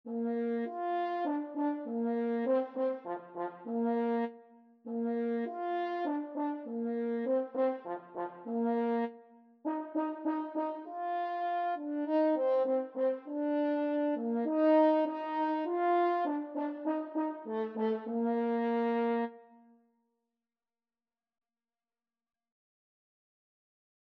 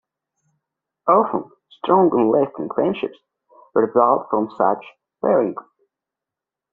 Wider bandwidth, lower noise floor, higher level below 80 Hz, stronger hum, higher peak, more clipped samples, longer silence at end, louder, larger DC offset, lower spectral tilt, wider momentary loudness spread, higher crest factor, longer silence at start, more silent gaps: first, 5.2 kHz vs 4.3 kHz; about the same, under -90 dBFS vs -87 dBFS; second, under -90 dBFS vs -66 dBFS; neither; second, -16 dBFS vs -2 dBFS; neither; first, 4.7 s vs 1.1 s; second, -33 LUFS vs -19 LUFS; neither; second, -5 dB/octave vs -6.5 dB/octave; second, 9 LU vs 12 LU; about the same, 18 dB vs 18 dB; second, 0.05 s vs 1.05 s; neither